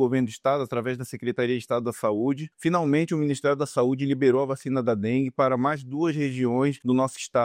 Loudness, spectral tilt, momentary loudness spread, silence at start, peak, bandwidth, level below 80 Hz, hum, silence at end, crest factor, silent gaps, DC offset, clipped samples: -25 LUFS; -6.5 dB/octave; 5 LU; 0 s; -10 dBFS; 15.5 kHz; -68 dBFS; none; 0 s; 16 dB; none; under 0.1%; under 0.1%